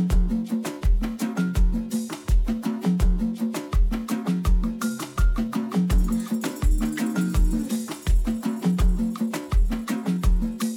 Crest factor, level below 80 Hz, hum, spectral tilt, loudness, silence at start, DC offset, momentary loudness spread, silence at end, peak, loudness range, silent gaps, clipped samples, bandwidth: 12 dB; -24 dBFS; none; -6.5 dB/octave; -25 LUFS; 0 s; under 0.1%; 4 LU; 0 s; -10 dBFS; 1 LU; none; under 0.1%; 16.5 kHz